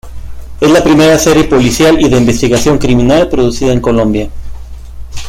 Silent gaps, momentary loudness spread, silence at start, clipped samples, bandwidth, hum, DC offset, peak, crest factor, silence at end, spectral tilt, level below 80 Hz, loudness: none; 10 LU; 0.05 s; under 0.1%; 16.5 kHz; none; under 0.1%; 0 dBFS; 8 dB; 0 s; -5 dB/octave; -24 dBFS; -9 LUFS